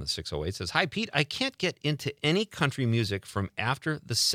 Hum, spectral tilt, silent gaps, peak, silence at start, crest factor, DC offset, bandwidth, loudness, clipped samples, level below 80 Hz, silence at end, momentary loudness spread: none; -4 dB/octave; none; -6 dBFS; 0 s; 22 dB; under 0.1%; 16 kHz; -29 LUFS; under 0.1%; -56 dBFS; 0 s; 5 LU